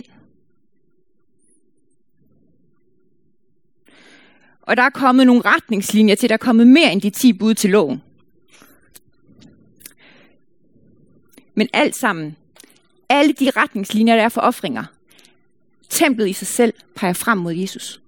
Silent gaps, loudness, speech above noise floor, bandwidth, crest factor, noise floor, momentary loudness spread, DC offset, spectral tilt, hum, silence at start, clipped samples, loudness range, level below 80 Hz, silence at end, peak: none; -16 LUFS; 52 dB; 17.5 kHz; 18 dB; -67 dBFS; 13 LU; 0.2%; -4 dB/octave; none; 4.65 s; under 0.1%; 10 LU; -66 dBFS; 0.15 s; 0 dBFS